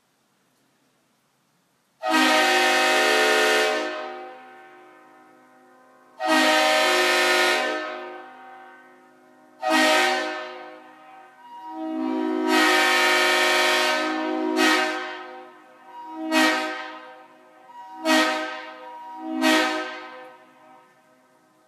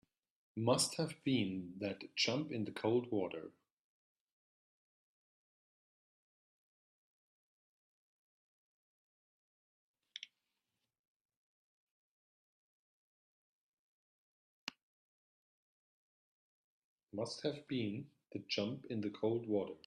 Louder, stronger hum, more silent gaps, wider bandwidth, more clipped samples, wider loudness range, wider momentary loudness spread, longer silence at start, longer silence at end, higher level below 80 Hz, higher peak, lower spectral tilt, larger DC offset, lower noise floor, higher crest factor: first, -20 LUFS vs -39 LUFS; neither; second, none vs 3.72-9.94 s, 10.99-11.29 s, 11.36-14.67 s, 14.83-17.07 s; first, 15.5 kHz vs 12 kHz; neither; second, 5 LU vs 23 LU; first, 21 LU vs 15 LU; first, 2 s vs 0.55 s; first, 1.35 s vs 0.1 s; second, under -90 dBFS vs -84 dBFS; first, -6 dBFS vs -20 dBFS; second, 0.5 dB/octave vs -4.5 dB/octave; neither; second, -66 dBFS vs -89 dBFS; about the same, 20 dB vs 24 dB